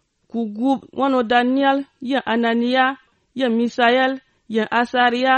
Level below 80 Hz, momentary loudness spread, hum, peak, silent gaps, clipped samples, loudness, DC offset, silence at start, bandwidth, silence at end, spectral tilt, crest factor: -64 dBFS; 10 LU; none; -4 dBFS; none; under 0.1%; -19 LUFS; under 0.1%; 0.35 s; 8.6 kHz; 0 s; -5 dB/octave; 16 dB